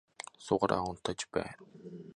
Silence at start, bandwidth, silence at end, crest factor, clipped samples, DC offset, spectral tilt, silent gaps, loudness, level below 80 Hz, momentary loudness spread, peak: 0.2 s; 11 kHz; 0.05 s; 24 dB; under 0.1%; under 0.1%; -4.5 dB/octave; none; -34 LUFS; -60 dBFS; 19 LU; -12 dBFS